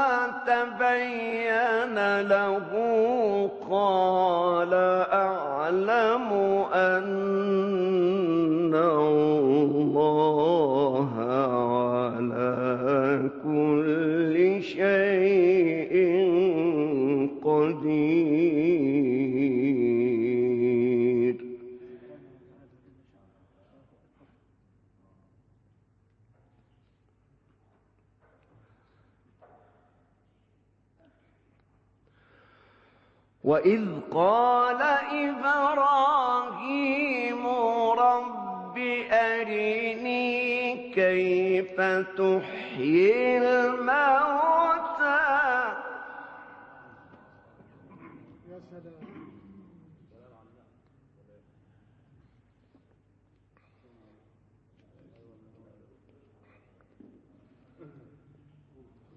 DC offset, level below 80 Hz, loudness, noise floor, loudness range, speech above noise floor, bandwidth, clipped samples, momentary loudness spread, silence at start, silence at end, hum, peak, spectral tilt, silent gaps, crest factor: under 0.1%; -68 dBFS; -24 LUFS; -67 dBFS; 5 LU; 42 dB; 6.8 kHz; under 0.1%; 7 LU; 0 s; 1.35 s; none; -10 dBFS; -7.5 dB/octave; none; 16 dB